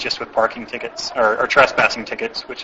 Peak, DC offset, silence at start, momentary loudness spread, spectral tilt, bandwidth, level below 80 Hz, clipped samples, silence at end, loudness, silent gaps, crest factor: 0 dBFS; under 0.1%; 0 s; 12 LU; -2.5 dB/octave; 8 kHz; -52 dBFS; under 0.1%; 0 s; -18 LUFS; none; 20 dB